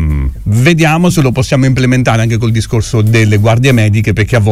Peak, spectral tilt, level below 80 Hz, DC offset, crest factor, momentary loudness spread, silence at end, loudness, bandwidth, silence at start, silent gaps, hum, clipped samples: 0 dBFS; -6 dB/octave; -24 dBFS; under 0.1%; 8 dB; 5 LU; 0 s; -10 LUFS; 15 kHz; 0 s; none; none; under 0.1%